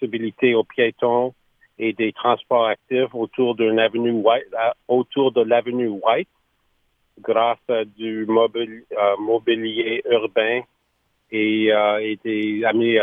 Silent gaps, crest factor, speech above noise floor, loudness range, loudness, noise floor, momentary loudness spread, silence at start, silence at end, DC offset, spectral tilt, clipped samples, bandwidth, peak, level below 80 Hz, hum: none; 18 dB; 49 dB; 2 LU; -20 LUFS; -68 dBFS; 7 LU; 0 s; 0 s; under 0.1%; -8 dB/octave; under 0.1%; 3.8 kHz; -2 dBFS; -72 dBFS; none